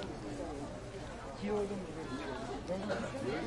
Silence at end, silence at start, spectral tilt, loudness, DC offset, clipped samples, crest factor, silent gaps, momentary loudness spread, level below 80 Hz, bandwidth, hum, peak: 0 s; 0 s; -5.5 dB/octave; -41 LUFS; under 0.1%; under 0.1%; 16 dB; none; 8 LU; -54 dBFS; 11.5 kHz; none; -24 dBFS